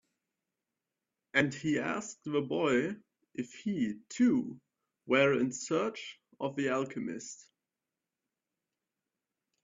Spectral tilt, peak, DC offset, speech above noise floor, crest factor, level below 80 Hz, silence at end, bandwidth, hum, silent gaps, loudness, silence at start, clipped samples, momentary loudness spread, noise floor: -5 dB/octave; -10 dBFS; under 0.1%; over 58 dB; 24 dB; -76 dBFS; 2.2 s; 7.8 kHz; none; none; -32 LUFS; 1.35 s; under 0.1%; 16 LU; under -90 dBFS